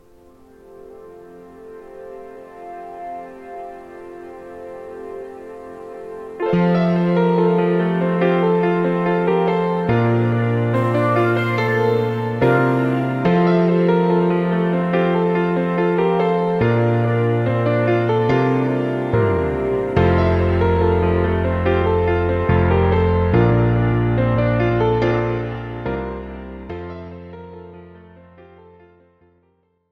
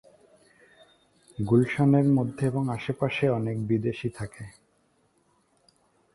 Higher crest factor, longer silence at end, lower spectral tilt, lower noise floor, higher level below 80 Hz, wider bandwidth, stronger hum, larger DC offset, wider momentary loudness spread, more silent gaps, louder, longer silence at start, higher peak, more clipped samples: about the same, 18 dB vs 18 dB; first, 1.95 s vs 1.65 s; first, -9.5 dB/octave vs -8 dB/octave; second, -63 dBFS vs -68 dBFS; first, -36 dBFS vs -58 dBFS; second, 6.2 kHz vs 11.5 kHz; neither; neither; about the same, 19 LU vs 17 LU; neither; first, -18 LUFS vs -26 LUFS; second, 0.7 s vs 1.4 s; first, -2 dBFS vs -10 dBFS; neither